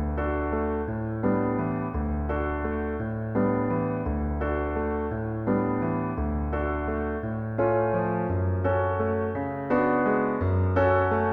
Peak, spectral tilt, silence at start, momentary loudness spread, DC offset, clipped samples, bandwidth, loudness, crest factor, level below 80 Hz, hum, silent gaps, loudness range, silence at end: -12 dBFS; -11 dB/octave; 0 s; 6 LU; under 0.1%; under 0.1%; 4.4 kHz; -27 LUFS; 14 dB; -36 dBFS; none; none; 3 LU; 0 s